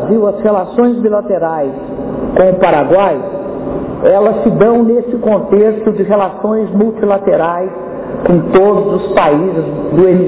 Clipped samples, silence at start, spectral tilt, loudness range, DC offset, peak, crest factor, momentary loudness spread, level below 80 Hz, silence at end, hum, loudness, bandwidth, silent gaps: under 0.1%; 0 s; -11.5 dB/octave; 2 LU; under 0.1%; 0 dBFS; 10 dB; 10 LU; -40 dBFS; 0 s; none; -12 LUFS; 4 kHz; none